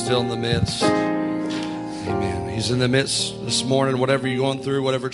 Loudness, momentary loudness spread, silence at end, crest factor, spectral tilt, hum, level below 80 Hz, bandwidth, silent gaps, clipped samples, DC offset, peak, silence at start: -22 LUFS; 6 LU; 0 s; 18 dB; -4.5 dB/octave; none; -48 dBFS; 11.5 kHz; none; under 0.1%; under 0.1%; -4 dBFS; 0 s